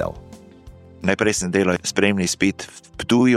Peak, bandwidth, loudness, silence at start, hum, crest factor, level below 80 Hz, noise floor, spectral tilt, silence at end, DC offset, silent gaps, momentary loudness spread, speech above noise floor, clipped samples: -2 dBFS; 14 kHz; -20 LUFS; 0 s; none; 20 dB; -48 dBFS; -44 dBFS; -4.5 dB/octave; 0 s; under 0.1%; none; 14 LU; 24 dB; under 0.1%